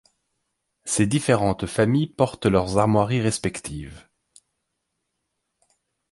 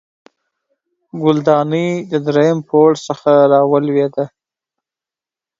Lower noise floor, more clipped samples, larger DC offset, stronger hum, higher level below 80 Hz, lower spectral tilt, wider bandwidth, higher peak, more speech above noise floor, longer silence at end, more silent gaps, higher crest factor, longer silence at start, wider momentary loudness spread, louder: second, -78 dBFS vs -89 dBFS; neither; neither; neither; first, -48 dBFS vs -62 dBFS; second, -5.5 dB/octave vs -7 dB/octave; first, 11.5 kHz vs 7.8 kHz; second, -4 dBFS vs 0 dBFS; second, 57 dB vs 76 dB; first, 2.15 s vs 1.35 s; neither; about the same, 20 dB vs 16 dB; second, 0.85 s vs 1.15 s; first, 14 LU vs 8 LU; second, -22 LUFS vs -14 LUFS